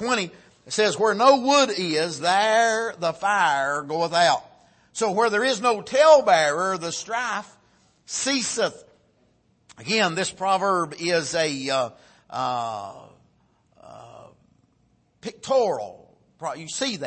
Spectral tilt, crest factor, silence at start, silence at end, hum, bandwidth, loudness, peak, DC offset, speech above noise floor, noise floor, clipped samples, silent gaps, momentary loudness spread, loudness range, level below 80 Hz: -2.5 dB/octave; 20 dB; 0 s; 0 s; none; 8.8 kHz; -22 LUFS; -2 dBFS; under 0.1%; 42 dB; -64 dBFS; under 0.1%; none; 14 LU; 10 LU; -70 dBFS